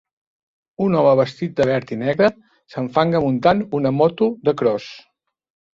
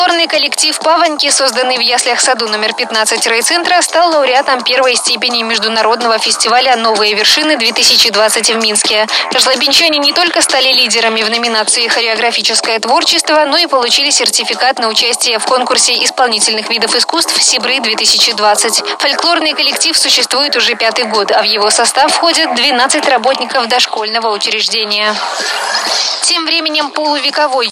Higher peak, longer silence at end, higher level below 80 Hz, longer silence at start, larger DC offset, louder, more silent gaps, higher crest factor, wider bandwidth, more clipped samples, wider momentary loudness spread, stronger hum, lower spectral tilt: about the same, -2 dBFS vs 0 dBFS; first, 0.75 s vs 0 s; about the same, -56 dBFS vs -58 dBFS; first, 0.8 s vs 0 s; neither; second, -19 LUFS vs -9 LUFS; neither; first, 18 dB vs 12 dB; second, 7.6 kHz vs 17 kHz; neither; first, 7 LU vs 4 LU; neither; first, -8 dB/octave vs 0.5 dB/octave